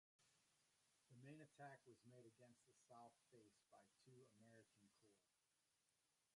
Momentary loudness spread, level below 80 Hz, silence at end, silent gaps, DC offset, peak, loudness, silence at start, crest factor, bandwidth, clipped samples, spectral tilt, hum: 6 LU; under -90 dBFS; 0 s; none; under 0.1%; -50 dBFS; -66 LUFS; 0.2 s; 22 dB; 11 kHz; under 0.1%; -5 dB/octave; none